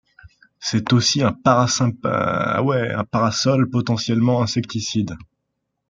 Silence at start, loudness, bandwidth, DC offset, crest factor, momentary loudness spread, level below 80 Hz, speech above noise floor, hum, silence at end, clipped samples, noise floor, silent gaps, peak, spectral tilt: 0.25 s; -19 LUFS; 9 kHz; under 0.1%; 18 dB; 7 LU; -54 dBFS; 57 dB; none; 0.65 s; under 0.1%; -76 dBFS; none; -2 dBFS; -5 dB/octave